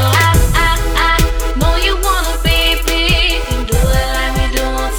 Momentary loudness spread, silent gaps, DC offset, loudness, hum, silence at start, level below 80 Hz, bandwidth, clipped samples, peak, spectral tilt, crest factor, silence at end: 5 LU; none; under 0.1%; -14 LUFS; none; 0 s; -16 dBFS; 19.5 kHz; under 0.1%; 0 dBFS; -3.5 dB/octave; 12 dB; 0 s